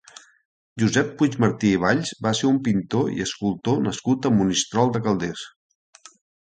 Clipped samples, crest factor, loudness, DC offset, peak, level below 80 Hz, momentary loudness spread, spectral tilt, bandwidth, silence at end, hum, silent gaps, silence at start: under 0.1%; 20 dB; -22 LUFS; under 0.1%; -4 dBFS; -54 dBFS; 6 LU; -5 dB/octave; 9.4 kHz; 0.95 s; none; none; 0.75 s